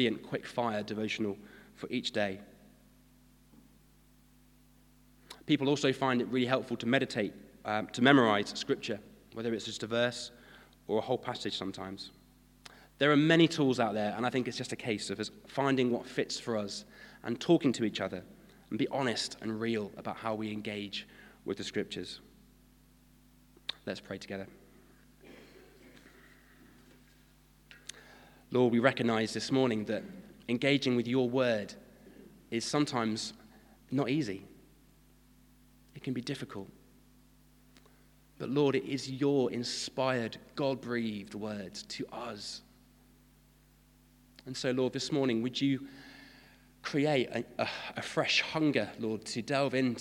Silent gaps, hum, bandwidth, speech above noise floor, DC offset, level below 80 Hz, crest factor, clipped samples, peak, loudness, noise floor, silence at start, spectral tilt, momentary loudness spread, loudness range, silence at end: none; none; 16.5 kHz; 31 dB; under 0.1%; -68 dBFS; 26 dB; under 0.1%; -6 dBFS; -32 LUFS; -63 dBFS; 0 s; -5 dB/octave; 17 LU; 13 LU; 0 s